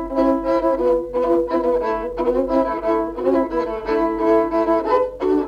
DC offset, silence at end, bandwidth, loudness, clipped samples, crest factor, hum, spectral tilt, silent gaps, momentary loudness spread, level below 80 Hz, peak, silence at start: under 0.1%; 0 s; 7 kHz; -19 LUFS; under 0.1%; 12 dB; none; -7.5 dB/octave; none; 4 LU; -42 dBFS; -6 dBFS; 0 s